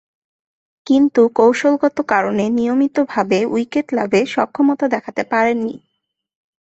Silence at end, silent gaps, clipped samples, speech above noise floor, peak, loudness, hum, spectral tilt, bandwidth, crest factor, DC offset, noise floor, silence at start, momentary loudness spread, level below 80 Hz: 0.85 s; none; under 0.1%; 59 dB; -2 dBFS; -16 LUFS; none; -6 dB/octave; 8.2 kHz; 16 dB; under 0.1%; -75 dBFS; 0.85 s; 7 LU; -60 dBFS